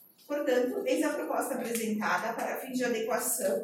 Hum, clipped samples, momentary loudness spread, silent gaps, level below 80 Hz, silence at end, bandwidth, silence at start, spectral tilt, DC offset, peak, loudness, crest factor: none; under 0.1%; 5 LU; none; -86 dBFS; 0 s; 17 kHz; 0.3 s; -3 dB/octave; under 0.1%; -16 dBFS; -31 LUFS; 16 dB